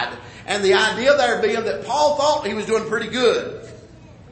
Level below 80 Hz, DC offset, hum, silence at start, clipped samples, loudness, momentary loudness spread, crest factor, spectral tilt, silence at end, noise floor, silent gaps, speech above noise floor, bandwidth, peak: -52 dBFS; under 0.1%; none; 0 s; under 0.1%; -19 LUFS; 11 LU; 16 dB; -3 dB/octave; 0 s; -43 dBFS; none; 24 dB; 8.8 kHz; -4 dBFS